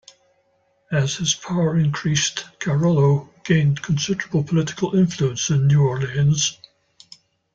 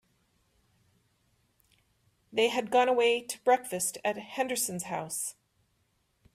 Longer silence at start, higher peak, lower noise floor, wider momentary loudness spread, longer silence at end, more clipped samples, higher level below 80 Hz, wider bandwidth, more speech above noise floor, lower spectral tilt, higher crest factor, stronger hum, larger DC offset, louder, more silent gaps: second, 0.9 s vs 2.3 s; first, -6 dBFS vs -12 dBFS; second, -64 dBFS vs -74 dBFS; second, 6 LU vs 10 LU; about the same, 1 s vs 1.05 s; neither; first, -52 dBFS vs -74 dBFS; second, 7.8 kHz vs 15.5 kHz; about the same, 45 dB vs 45 dB; first, -5 dB/octave vs -2 dB/octave; about the same, 16 dB vs 20 dB; neither; neither; first, -20 LUFS vs -29 LUFS; neither